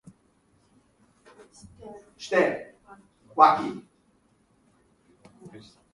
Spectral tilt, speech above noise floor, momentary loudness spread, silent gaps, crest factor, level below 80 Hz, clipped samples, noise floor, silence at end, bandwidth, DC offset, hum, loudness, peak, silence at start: -5 dB/octave; 41 dB; 29 LU; none; 26 dB; -68 dBFS; under 0.1%; -65 dBFS; 0.45 s; 11.5 kHz; under 0.1%; none; -23 LUFS; -2 dBFS; 1.85 s